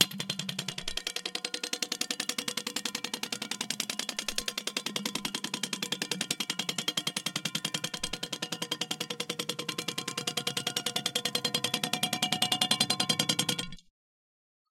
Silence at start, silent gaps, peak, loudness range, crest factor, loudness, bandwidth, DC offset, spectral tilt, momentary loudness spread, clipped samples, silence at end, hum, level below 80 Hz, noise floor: 0 s; none; -2 dBFS; 5 LU; 32 dB; -31 LUFS; 17 kHz; under 0.1%; -1.5 dB/octave; 8 LU; under 0.1%; 0.9 s; none; -62 dBFS; under -90 dBFS